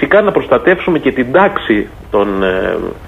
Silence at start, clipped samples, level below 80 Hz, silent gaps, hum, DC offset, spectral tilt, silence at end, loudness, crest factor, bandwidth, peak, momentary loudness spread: 0 s; under 0.1%; -36 dBFS; none; none; under 0.1%; -7.5 dB/octave; 0 s; -13 LUFS; 12 dB; 8 kHz; 0 dBFS; 5 LU